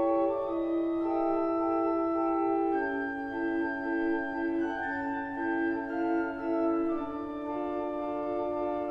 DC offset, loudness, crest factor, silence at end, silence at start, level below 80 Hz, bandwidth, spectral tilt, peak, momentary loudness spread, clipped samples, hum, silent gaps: under 0.1%; -31 LUFS; 14 dB; 0 s; 0 s; -60 dBFS; 5.6 kHz; -7.5 dB/octave; -18 dBFS; 5 LU; under 0.1%; none; none